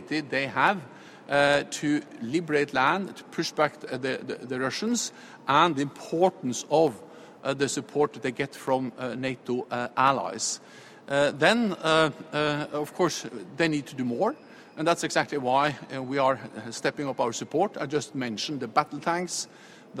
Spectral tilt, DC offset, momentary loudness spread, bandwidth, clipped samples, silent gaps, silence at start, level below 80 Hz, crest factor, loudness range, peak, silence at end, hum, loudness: -4 dB/octave; under 0.1%; 11 LU; 15.5 kHz; under 0.1%; none; 0 s; -68 dBFS; 22 dB; 3 LU; -4 dBFS; 0 s; none; -27 LUFS